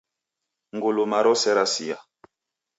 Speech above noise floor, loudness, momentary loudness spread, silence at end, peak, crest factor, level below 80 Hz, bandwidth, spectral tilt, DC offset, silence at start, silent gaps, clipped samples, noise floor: 63 dB; -22 LUFS; 15 LU; 0.75 s; -8 dBFS; 18 dB; -78 dBFS; 8 kHz; -2.5 dB/octave; under 0.1%; 0.75 s; none; under 0.1%; -85 dBFS